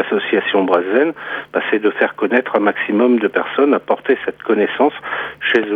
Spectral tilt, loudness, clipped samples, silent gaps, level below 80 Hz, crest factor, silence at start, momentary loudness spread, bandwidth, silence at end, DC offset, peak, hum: -7 dB/octave; -16 LUFS; under 0.1%; none; -62 dBFS; 16 dB; 0 s; 6 LU; 4.8 kHz; 0 s; under 0.1%; 0 dBFS; none